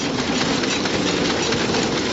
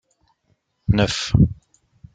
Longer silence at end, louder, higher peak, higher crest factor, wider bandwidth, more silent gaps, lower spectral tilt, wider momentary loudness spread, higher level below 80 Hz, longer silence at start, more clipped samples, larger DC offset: second, 0 s vs 0.6 s; about the same, -20 LUFS vs -20 LUFS; second, -8 dBFS vs -2 dBFS; second, 14 dB vs 20 dB; second, 8 kHz vs 9.2 kHz; neither; second, -3.5 dB/octave vs -6 dB/octave; second, 1 LU vs 13 LU; second, -44 dBFS vs -34 dBFS; second, 0 s vs 0.9 s; neither; neither